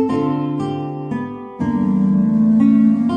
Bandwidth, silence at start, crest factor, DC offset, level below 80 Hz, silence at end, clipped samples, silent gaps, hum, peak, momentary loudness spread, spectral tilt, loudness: 5.4 kHz; 0 s; 12 dB; under 0.1%; -48 dBFS; 0 s; under 0.1%; none; none; -4 dBFS; 12 LU; -9.5 dB/octave; -17 LUFS